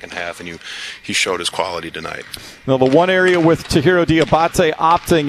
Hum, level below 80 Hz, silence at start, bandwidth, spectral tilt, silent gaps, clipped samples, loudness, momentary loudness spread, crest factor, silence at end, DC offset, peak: none; -40 dBFS; 0 s; 14 kHz; -5 dB/octave; none; under 0.1%; -15 LUFS; 15 LU; 16 dB; 0 s; under 0.1%; 0 dBFS